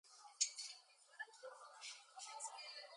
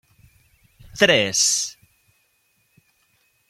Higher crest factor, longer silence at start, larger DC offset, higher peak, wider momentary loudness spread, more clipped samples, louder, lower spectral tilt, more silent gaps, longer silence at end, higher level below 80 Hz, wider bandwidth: first, 30 dB vs 24 dB; second, 0.05 s vs 0.85 s; neither; second, -22 dBFS vs -2 dBFS; first, 17 LU vs 14 LU; neither; second, -48 LUFS vs -18 LUFS; second, 6.5 dB/octave vs -1.5 dB/octave; neither; second, 0 s vs 1.75 s; second, under -90 dBFS vs -58 dBFS; second, 11 kHz vs 16.5 kHz